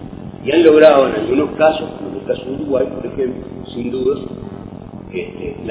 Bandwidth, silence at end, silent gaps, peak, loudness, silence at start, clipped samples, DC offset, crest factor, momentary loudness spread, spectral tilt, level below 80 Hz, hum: 4 kHz; 0 s; none; 0 dBFS; -15 LUFS; 0 s; 0.2%; under 0.1%; 16 dB; 20 LU; -10 dB/octave; -44 dBFS; none